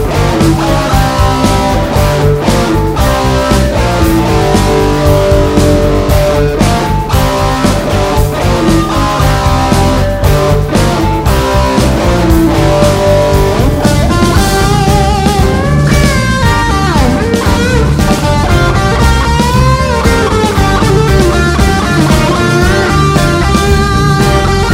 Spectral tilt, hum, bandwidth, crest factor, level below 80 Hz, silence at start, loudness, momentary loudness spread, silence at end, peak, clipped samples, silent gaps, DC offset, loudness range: -5.5 dB/octave; none; 16.5 kHz; 8 dB; -16 dBFS; 0 s; -9 LUFS; 2 LU; 0 s; 0 dBFS; 0.6%; none; under 0.1%; 1 LU